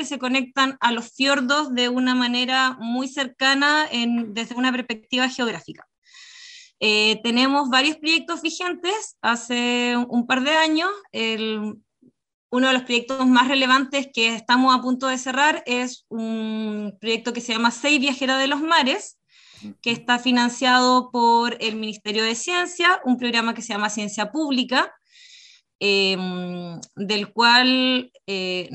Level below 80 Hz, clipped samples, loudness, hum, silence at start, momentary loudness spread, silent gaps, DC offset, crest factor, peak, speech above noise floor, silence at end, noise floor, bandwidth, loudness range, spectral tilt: -72 dBFS; under 0.1%; -20 LUFS; none; 0 s; 10 LU; 5.98-6.02 s, 12.34-12.49 s, 25.75-25.79 s; under 0.1%; 18 dB; -2 dBFS; 38 dB; 0 s; -60 dBFS; 9.2 kHz; 3 LU; -2.5 dB/octave